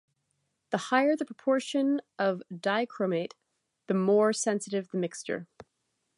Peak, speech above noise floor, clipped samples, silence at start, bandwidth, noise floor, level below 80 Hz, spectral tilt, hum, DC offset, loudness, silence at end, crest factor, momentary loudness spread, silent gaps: -10 dBFS; 51 dB; under 0.1%; 0.7 s; 11.5 kHz; -79 dBFS; -80 dBFS; -5 dB/octave; none; under 0.1%; -29 LUFS; 0.75 s; 20 dB; 10 LU; none